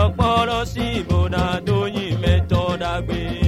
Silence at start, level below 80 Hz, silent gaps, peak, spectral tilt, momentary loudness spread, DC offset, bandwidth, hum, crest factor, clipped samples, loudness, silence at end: 0 s; -30 dBFS; none; -4 dBFS; -6.5 dB/octave; 6 LU; under 0.1%; 13 kHz; none; 16 dB; under 0.1%; -20 LUFS; 0 s